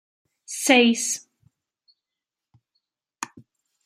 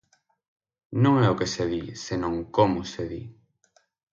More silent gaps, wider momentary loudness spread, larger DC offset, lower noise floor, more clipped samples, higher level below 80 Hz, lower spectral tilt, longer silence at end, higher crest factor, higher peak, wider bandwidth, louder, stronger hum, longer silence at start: neither; first, 20 LU vs 14 LU; neither; first, -88 dBFS vs -66 dBFS; neither; second, -80 dBFS vs -52 dBFS; second, -1.5 dB/octave vs -6.5 dB/octave; second, 0.6 s vs 0.8 s; about the same, 24 dB vs 22 dB; first, -2 dBFS vs -6 dBFS; first, 15.5 kHz vs 7.6 kHz; first, -20 LUFS vs -25 LUFS; neither; second, 0.5 s vs 0.9 s